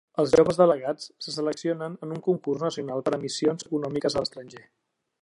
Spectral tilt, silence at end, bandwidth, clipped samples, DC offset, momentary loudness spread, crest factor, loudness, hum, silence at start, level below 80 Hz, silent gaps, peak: -5.5 dB/octave; 0.6 s; 11.5 kHz; under 0.1%; under 0.1%; 13 LU; 20 dB; -26 LUFS; none; 0.15 s; -62 dBFS; none; -6 dBFS